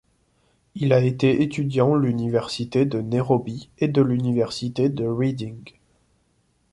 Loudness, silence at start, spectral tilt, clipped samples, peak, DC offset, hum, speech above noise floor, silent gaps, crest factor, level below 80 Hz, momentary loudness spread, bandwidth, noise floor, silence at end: -22 LUFS; 0.75 s; -7.5 dB/octave; under 0.1%; -4 dBFS; under 0.1%; none; 44 dB; none; 18 dB; -56 dBFS; 7 LU; 11.5 kHz; -66 dBFS; 1.05 s